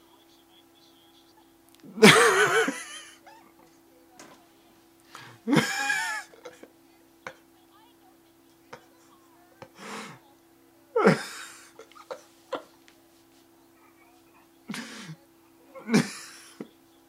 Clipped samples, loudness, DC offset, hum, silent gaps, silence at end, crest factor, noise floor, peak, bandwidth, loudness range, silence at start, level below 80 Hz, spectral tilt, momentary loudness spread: under 0.1%; -23 LUFS; under 0.1%; none; none; 0.45 s; 30 dB; -59 dBFS; 0 dBFS; 16 kHz; 22 LU; 1.95 s; -74 dBFS; -3.5 dB/octave; 28 LU